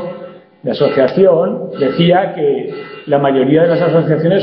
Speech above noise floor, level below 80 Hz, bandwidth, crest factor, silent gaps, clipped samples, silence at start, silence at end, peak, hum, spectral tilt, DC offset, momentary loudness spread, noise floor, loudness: 21 dB; -56 dBFS; 5.6 kHz; 12 dB; none; under 0.1%; 0 s; 0 s; 0 dBFS; none; -10 dB/octave; under 0.1%; 15 LU; -33 dBFS; -13 LUFS